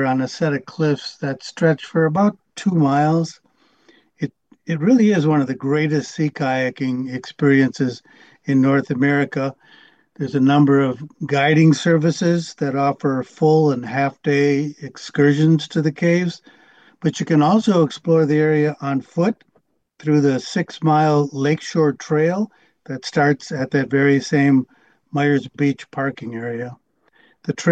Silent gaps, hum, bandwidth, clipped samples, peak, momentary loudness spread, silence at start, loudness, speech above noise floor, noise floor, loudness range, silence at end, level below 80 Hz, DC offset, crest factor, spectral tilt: none; none; 8.6 kHz; under 0.1%; -2 dBFS; 12 LU; 0 s; -19 LUFS; 45 dB; -63 dBFS; 3 LU; 0 s; -64 dBFS; under 0.1%; 16 dB; -7 dB/octave